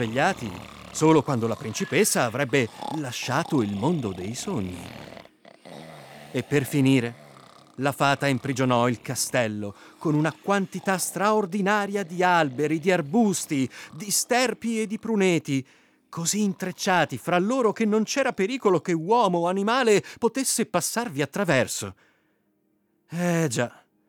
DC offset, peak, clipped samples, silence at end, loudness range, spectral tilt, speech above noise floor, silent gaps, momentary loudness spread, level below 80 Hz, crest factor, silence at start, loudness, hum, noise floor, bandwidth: under 0.1%; -8 dBFS; under 0.1%; 0.4 s; 5 LU; -4.5 dB/octave; 45 dB; none; 12 LU; -66 dBFS; 16 dB; 0 s; -24 LUFS; none; -69 dBFS; 19.5 kHz